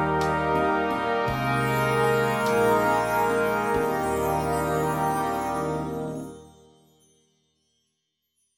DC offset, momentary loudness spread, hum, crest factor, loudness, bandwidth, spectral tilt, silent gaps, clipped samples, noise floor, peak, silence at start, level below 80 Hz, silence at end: under 0.1%; 7 LU; none; 16 dB; -24 LUFS; 17 kHz; -5.5 dB/octave; none; under 0.1%; -78 dBFS; -10 dBFS; 0 s; -48 dBFS; 2.1 s